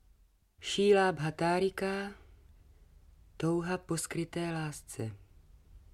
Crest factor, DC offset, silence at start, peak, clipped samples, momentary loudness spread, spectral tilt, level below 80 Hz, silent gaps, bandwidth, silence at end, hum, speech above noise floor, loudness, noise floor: 20 dB; under 0.1%; 0.6 s; -14 dBFS; under 0.1%; 15 LU; -5 dB/octave; -60 dBFS; none; 14.5 kHz; 0.15 s; none; 34 dB; -33 LUFS; -65 dBFS